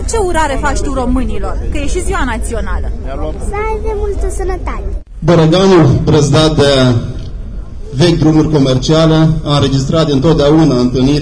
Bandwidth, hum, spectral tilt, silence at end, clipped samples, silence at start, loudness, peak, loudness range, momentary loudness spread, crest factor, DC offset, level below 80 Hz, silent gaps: 11 kHz; none; -6 dB/octave; 0 s; under 0.1%; 0 s; -12 LUFS; 0 dBFS; 8 LU; 13 LU; 10 dB; under 0.1%; -20 dBFS; none